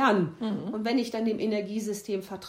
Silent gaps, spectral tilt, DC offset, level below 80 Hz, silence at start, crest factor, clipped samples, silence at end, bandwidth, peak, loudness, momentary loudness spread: none; -5.5 dB/octave; under 0.1%; -70 dBFS; 0 s; 18 dB; under 0.1%; 0 s; 16 kHz; -10 dBFS; -29 LUFS; 6 LU